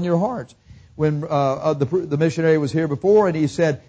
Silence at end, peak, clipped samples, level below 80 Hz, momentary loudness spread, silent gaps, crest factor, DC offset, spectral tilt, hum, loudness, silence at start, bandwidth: 0.1 s; -6 dBFS; under 0.1%; -52 dBFS; 7 LU; none; 14 dB; under 0.1%; -7.5 dB/octave; none; -20 LUFS; 0 s; 8 kHz